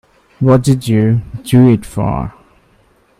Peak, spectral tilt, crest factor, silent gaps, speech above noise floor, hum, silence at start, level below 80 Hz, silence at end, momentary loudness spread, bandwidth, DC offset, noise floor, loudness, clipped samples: 0 dBFS; -8 dB/octave; 14 dB; none; 40 dB; none; 0.4 s; -36 dBFS; 0.9 s; 9 LU; 15 kHz; under 0.1%; -52 dBFS; -13 LUFS; under 0.1%